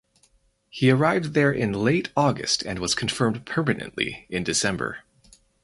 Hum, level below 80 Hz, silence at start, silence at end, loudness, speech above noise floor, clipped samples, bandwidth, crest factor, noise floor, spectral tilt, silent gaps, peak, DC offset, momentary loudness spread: none; -52 dBFS; 0.75 s; 0.65 s; -23 LUFS; 40 dB; under 0.1%; 11.5 kHz; 20 dB; -63 dBFS; -4.5 dB/octave; none; -6 dBFS; under 0.1%; 8 LU